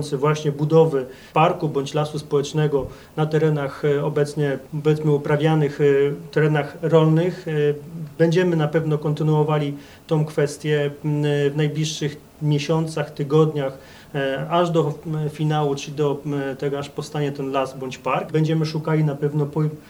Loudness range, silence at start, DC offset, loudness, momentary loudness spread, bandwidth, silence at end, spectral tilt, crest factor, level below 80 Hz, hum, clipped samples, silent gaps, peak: 4 LU; 0 s; under 0.1%; -21 LUFS; 8 LU; 12 kHz; 0.1 s; -7 dB/octave; 18 dB; -56 dBFS; none; under 0.1%; none; -4 dBFS